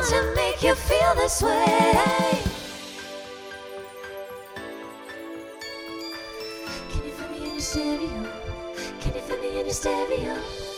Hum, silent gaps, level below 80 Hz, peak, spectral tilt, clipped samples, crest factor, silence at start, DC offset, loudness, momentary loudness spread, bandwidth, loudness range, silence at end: none; none; -38 dBFS; -6 dBFS; -4 dB/octave; under 0.1%; 20 dB; 0 s; under 0.1%; -25 LUFS; 17 LU; over 20 kHz; 14 LU; 0 s